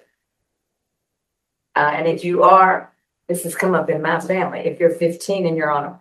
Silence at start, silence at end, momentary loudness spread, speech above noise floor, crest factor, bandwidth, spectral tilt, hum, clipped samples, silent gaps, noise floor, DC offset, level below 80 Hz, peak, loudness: 1.75 s; 0.05 s; 12 LU; 61 dB; 18 dB; 13 kHz; -5.5 dB/octave; none; under 0.1%; none; -78 dBFS; under 0.1%; -70 dBFS; 0 dBFS; -18 LUFS